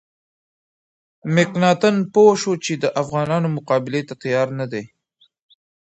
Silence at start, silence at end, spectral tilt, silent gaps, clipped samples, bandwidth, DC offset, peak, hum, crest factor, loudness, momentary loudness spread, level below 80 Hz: 1.25 s; 1 s; -5.5 dB/octave; none; under 0.1%; 8.2 kHz; under 0.1%; -2 dBFS; none; 18 dB; -19 LUFS; 12 LU; -64 dBFS